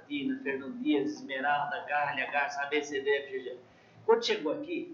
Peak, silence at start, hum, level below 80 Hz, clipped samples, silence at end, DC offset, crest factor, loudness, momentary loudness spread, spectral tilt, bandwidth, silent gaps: -12 dBFS; 0 s; none; -80 dBFS; under 0.1%; 0 s; under 0.1%; 20 dB; -31 LUFS; 9 LU; -3.5 dB/octave; 7.6 kHz; none